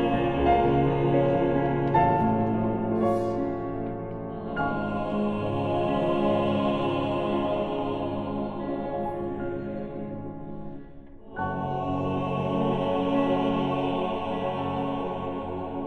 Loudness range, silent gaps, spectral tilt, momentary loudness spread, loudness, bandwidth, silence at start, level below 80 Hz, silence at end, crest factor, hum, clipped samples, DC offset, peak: 8 LU; none; -9 dB/octave; 11 LU; -27 LUFS; 8.8 kHz; 0 s; -46 dBFS; 0 s; 16 dB; none; under 0.1%; under 0.1%; -10 dBFS